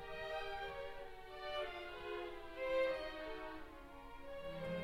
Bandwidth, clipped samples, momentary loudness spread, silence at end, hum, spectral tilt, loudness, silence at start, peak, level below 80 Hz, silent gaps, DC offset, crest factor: 16 kHz; under 0.1%; 15 LU; 0 s; none; -5 dB/octave; -45 LUFS; 0 s; -28 dBFS; -60 dBFS; none; under 0.1%; 16 dB